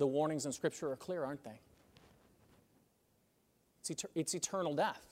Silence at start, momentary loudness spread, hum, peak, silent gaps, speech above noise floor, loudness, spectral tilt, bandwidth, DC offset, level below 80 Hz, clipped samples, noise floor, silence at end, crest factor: 0 s; 12 LU; none; -22 dBFS; none; 37 dB; -39 LUFS; -4 dB/octave; 16 kHz; under 0.1%; -78 dBFS; under 0.1%; -75 dBFS; 0.05 s; 18 dB